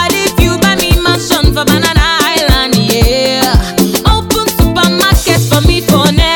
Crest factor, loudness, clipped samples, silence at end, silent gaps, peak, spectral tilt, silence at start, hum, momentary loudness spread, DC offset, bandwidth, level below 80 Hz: 10 dB; -9 LUFS; 0.4%; 0 s; none; 0 dBFS; -4 dB/octave; 0 s; none; 2 LU; under 0.1%; over 20 kHz; -16 dBFS